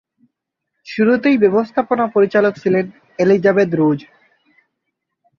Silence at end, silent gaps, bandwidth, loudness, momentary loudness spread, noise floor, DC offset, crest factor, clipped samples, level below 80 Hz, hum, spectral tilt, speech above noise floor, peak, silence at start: 1.4 s; none; 6.8 kHz; -15 LUFS; 6 LU; -77 dBFS; under 0.1%; 16 dB; under 0.1%; -60 dBFS; none; -8 dB/octave; 62 dB; -2 dBFS; 0.85 s